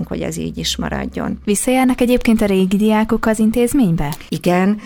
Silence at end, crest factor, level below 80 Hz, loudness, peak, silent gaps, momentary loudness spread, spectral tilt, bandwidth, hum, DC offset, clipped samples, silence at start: 0 s; 14 dB; -32 dBFS; -16 LUFS; -2 dBFS; none; 8 LU; -5.5 dB/octave; over 20 kHz; none; under 0.1%; under 0.1%; 0 s